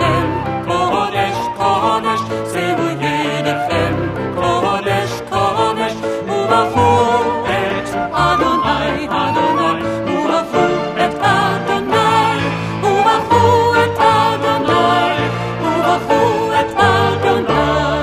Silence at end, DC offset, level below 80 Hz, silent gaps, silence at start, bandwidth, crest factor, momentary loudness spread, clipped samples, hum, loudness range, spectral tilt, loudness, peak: 0 s; under 0.1%; -40 dBFS; none; 0 s; 15.5 kHz; 14 dB; 7 LU; under 0.1%; none; 4 LU; -5.5 dB/octave; -15 LUFS; 0 dBFS